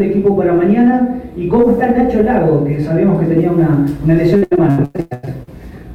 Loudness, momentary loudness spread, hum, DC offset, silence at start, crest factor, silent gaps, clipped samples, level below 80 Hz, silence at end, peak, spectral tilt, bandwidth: -13 LUFS; 10 LU; none; under 0.1%; 0 s; 10 dB; none; under 0.1%; -36 dBFS; 0 s; -2 dBFS; -10 dB/octave; 6.2 kHz